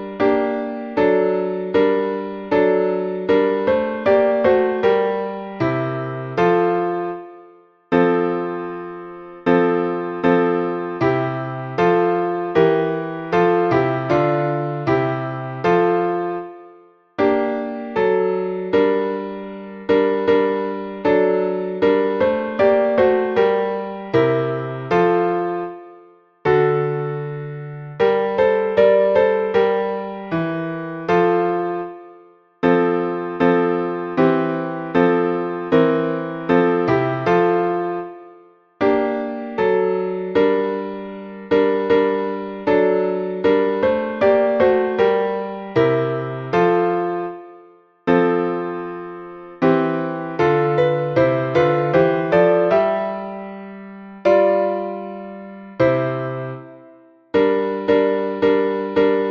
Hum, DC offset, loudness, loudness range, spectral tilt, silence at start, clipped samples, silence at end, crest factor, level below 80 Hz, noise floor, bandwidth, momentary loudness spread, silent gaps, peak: none; under 0.1%; -19 LUFS; 3 LU; -8.5 dB/octave; 0 s; under 0.1%; 0 s; 16 dB; -54 dBFS; -48 dBFS; 6.2 kHz; 11 LU; none; -2 dBFS